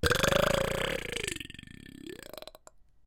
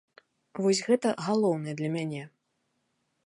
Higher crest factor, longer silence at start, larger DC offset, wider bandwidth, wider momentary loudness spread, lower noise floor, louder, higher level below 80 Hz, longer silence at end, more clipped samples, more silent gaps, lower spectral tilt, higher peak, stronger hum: first, 24 dB vs 18 dB; second, 0 s vs 0.55 s; neither; first, 17 kHz vs 11.5 kHz; first, 22 LU vs 15 LU; second, -57 dBFS vs -77 dBFS; about the same, -29 LUFS vs -28 LUFS; first, -44 dBFS vs -78 dBFS; second, 0.25 s vs 0.95 s; neither; neither; second, -3.5 dB/octave vs -5.5 dB/octave; first, -8 dBFS vs -12 dBFS; neither